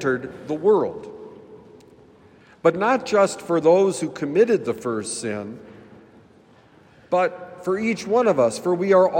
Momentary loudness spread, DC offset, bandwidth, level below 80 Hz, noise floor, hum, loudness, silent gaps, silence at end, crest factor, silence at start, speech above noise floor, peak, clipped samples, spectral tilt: 14 LU; under 0.1%; 16 kHz; -66 dBFS; -52 dBFS; none; -21 LUFS; none; 0 s; 18 dB; 0 s; 32 dB; -4 dBFS; under 0.1%; -5.5 dB/octave